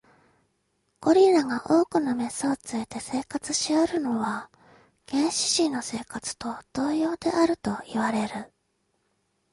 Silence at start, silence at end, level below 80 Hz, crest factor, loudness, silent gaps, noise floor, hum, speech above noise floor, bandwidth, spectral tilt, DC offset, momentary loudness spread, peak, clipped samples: 1 s; 1.05 s; -62 dBFS; 18 dB; -26 LUFS; none; -73 dBFS; none; 48 dB; 11.5 kHz; -3.5 dB/octave; under 0.1%; 11 LU; -8 dBFS; under 0.1%